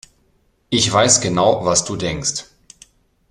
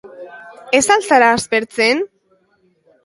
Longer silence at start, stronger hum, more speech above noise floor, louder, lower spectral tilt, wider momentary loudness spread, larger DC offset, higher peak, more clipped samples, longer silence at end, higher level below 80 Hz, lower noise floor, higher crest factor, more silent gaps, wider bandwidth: first, 0.7 s vs 0.05 s; neither; about the same, 44 dB vs 45 dB; about the same, -16 LUFS vs -14 LUFS; about the same, -3 dB/octave vs -2 dB/octave; second, 10 LU vs 23 LU; neither; about the same, 0 dBFS vs 0 dBFS; neither; about the same, 0.9 s vs 1 s; first, -48 dBFS vs -56 dBFS; about the same, -61 dBFS vs -59 dBFS; about the same, 20 dB vs 18 dB; neither; first, 13 kHz vs 11.5 kHz